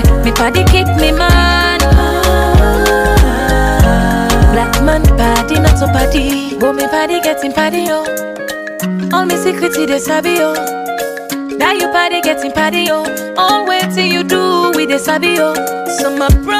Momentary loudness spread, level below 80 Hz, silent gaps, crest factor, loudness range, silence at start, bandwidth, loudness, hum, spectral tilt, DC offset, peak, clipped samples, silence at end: 8 LU; -16 dBFS; none; 12 dB; 4 LU; 0 s; 16 kHz; -12 LUFS; none; -5 dB/octave; under 0.1%; 0 dBFS; under 0.1%; 0 s